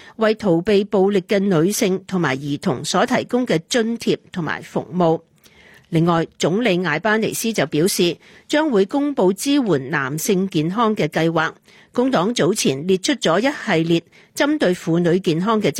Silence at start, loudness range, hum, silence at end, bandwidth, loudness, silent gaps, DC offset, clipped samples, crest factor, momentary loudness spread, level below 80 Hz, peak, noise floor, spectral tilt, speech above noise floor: 0.2 s; 2 LU; none; 0 s; 16.5 kHz; -19 LUFS; none; under 0.1%; under 0.1%; 14 dB; 5 LU; -58 dBFS; -4 dBFS; -49 dBFS; -5 dB/octave; 30 dB